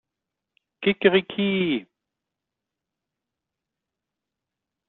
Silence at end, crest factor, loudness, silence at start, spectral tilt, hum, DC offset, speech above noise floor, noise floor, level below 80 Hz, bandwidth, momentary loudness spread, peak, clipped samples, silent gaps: 3.05 s; 24 dB; -23 LUFS; 0.8 s; -4 dB/octave; none; under 0.1%; 64 dB; -86 dBFS; -68 dBFS; 4.2 kHz; 7 LU; -4 dBFS; under 0.1%; none